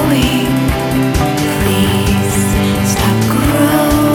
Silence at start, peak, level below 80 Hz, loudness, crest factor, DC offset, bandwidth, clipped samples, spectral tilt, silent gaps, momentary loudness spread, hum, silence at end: 0 s; 0 dBFS; -24 dBFS; -13 LUFS; 12 dB; under 0.1%; over 20 kHz; under 0.1%; -5 dB/octave; none; 3 LU; none; 0 s